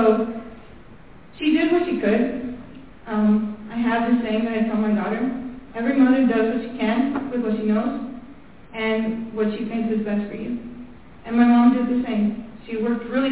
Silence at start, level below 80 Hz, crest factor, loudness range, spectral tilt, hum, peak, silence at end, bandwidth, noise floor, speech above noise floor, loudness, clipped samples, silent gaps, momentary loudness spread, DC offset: 0 s; -52 dBFS; 16 dB; 4 LU; -10.5 dB/octave; none; -4 dBFS; 0 s; 4 kHz; -46 dBFS; 26 dB; -22 LUFS; under 0.1%; none; 17 LU; 0.5%